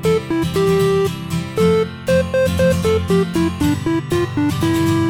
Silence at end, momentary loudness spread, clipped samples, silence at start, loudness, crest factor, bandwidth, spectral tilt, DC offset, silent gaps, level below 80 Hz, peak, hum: 0 s; 4 LU; under 0.1%; 0 s; -17 LUFS; 14 dB; 17 kHz; -6.5 dB/octave; under 0.1%; none; -38 dBFS; -4 dBFS; none